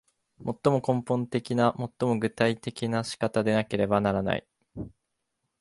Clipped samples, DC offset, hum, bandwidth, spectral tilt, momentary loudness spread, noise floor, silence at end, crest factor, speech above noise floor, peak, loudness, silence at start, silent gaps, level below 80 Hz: under 0.1%; under 0.1%; none; 11.5 kHz; -6.5 dB/octave; 14 LU; -80 dBFS; 0.7 s; 20 dB; 54 dB; -8 dBFS; -27 LUFS; 0.4 s; none; -56 dBFS